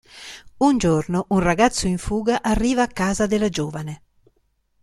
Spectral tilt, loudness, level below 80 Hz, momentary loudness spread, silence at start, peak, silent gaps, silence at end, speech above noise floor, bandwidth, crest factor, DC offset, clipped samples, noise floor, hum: -5 dB/octave; -20 LUFS; -38 dBFS; 17 LU; 0.15 s; -2 dBFS; none; 0.85 s; 46 dB; 13.5 kHz; 18 dB; under 0.1%; under 0.1%; -66 dBFS; none